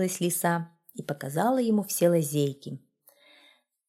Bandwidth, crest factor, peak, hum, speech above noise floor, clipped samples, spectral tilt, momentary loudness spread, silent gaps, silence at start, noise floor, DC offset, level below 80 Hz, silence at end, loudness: 16.5 kHz; 18 dB; -10 dBFS; none; 35 dB; under 0.1%; -5.5 dB/octave; 17 LU; none; 0 s; -62 dBFS; under 0.1%; -76 dBFS; 1.1 s; -27 LUFS